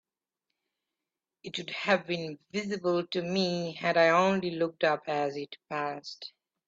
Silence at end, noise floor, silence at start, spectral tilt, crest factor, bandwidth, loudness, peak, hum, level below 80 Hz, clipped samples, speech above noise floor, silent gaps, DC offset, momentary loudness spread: 0.4 s; -89 dBFS; 1.45 s; -5 dB/octave; 20 dB; 7.8 kHz; -29 LUFS; -12 dBFS; none; -74 dBFS; under 0.1%; 60 dB; none; under 0.1%; 16 LU